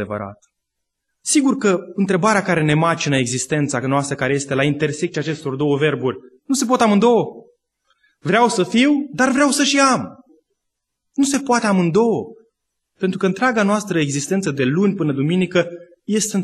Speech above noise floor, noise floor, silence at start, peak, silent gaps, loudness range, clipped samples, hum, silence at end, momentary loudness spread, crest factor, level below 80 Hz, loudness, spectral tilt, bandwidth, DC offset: 60 dB; -77 dBFS; 0 s; -2 dBFS; none; 3 LU; under 0.1%; none; 0 s; 10 LU; 16 dB; -58 dBFS; -18 LUFS; -4.5 dB/octave; 12.5 kHz; under 0.1%